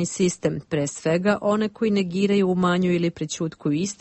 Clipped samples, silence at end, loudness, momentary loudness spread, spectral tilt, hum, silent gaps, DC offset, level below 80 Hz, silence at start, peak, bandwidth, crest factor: under 0.1%; 0.05 s; -23 LUFS; 6 LU; -5.5 dB/octave; none; none; under 0.1%; -58 dBFS; 0 s; -8 dBFS; 8.6 kHz; 14 dB